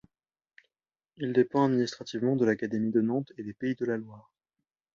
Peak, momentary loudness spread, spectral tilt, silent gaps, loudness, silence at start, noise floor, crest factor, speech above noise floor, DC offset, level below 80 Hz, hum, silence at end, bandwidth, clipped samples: -12 dBFS; 10 LU; -7 dB/octave; none; -29 LUFS; 1.2 s; under -90 dBFS; 18 dB; over 62 dB; under 0.1%; -72 dBFS; none; 0.75 s; 7.6 kHz; under 0.1%